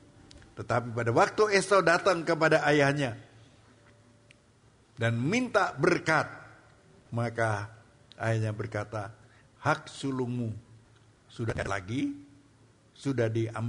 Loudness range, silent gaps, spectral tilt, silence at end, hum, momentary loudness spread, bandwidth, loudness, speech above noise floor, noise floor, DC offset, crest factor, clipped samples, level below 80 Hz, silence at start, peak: 9 LU; none; -5.5 dB/octave; 0 s; none; 15 LU; 10.5 kHz; -28 LUFS; 34 dB; -61 dBFS; under 0.1%; 20 dB; under 0.1%; -60 dBFS; 0.35 s; -10 dBFS